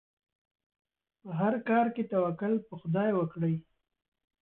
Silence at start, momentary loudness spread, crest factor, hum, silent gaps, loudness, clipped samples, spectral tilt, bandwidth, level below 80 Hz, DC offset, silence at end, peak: 1.25 s; 6 LU; 16 dB; none; none; -31 LUFS; under 0.1%; -11.5 dB/octave; 4.1 kHz; -72 dBFS; under 0.1%; 0.8 s; -16 dBFS